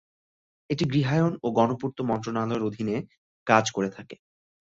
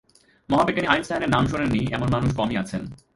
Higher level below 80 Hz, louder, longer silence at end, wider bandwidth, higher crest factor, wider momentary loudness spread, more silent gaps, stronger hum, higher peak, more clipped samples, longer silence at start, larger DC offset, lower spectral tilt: second, -62 dBFS vs -42 dBFS; second, -26 LUFS vs -23 LUFS; first, 0.65 s vs 0.2 s; second, 7.8 kHz vs 11.5 kHz; about the same, 22 dB vs 20 dB; first, 12 LU vs 6 LU; first, 3.18-3.46 s vs none; neither; about the same, -4 dBFS vs -2 dBFS; neither; first, 0.7 s vs 0.5 s; neither; about the same, -6 dB/octave vs -6.5 dB/octave